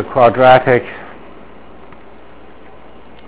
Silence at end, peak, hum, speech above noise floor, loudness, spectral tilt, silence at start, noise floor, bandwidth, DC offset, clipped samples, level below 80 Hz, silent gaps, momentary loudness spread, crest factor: 2.2 s; 0 dBFS; none; 30 dB; -10 LUFS; -9.5 dB/octave; 0 s; -40 dBFS; 4 kHz; 2%; 0.6%; -46 dBFS; none; 24 LU; 16 dB